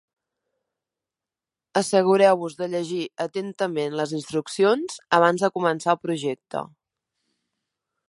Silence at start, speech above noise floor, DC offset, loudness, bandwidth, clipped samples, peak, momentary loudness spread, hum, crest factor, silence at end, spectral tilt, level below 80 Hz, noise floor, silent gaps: 1.75 s; 67 dB; under 0.1%; -23 LUFS; 11.5 kHz; under 0.1%; -4 dBFS; 11 LU; none; 22 dB; 1.45 s; -5 dB/octave; -76 dBFS; -90 dBFS; none